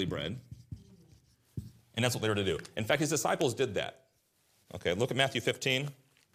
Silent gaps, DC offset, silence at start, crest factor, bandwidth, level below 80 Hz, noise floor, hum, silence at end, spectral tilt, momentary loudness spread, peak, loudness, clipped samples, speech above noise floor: none; under 0.1%; 0 s; 24 dB; 15.5 kHz; -64 dBFS; -72 dBFS; none; 0.4 s; -4 dB/octave; 18 LU; -10 dBFS; -32 LUFS; under 0.1%; 40 dB